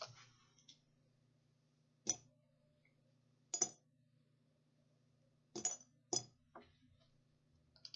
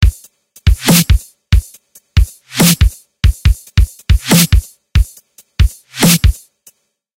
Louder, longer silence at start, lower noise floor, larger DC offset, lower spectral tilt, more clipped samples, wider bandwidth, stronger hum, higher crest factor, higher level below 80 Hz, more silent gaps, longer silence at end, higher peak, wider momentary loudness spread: second, -43 LUFS vs -13 LUFS; about the same, 0 s vs 0 s; first, -77 dBFS vs -49 dBFS; neither; second, -2.5 dB/octave vs -4.5 dB/octave; neither; second, 8 kHz vs 17 kHz; neither; first, 32 dB vs 12 dB; second, -90 dBFS vs -16 dBFS; neither; second, 0.05 s vs 0.85 s; second, -20 dBFS vs 0 dBFS; first, 24 LU vs 8 LU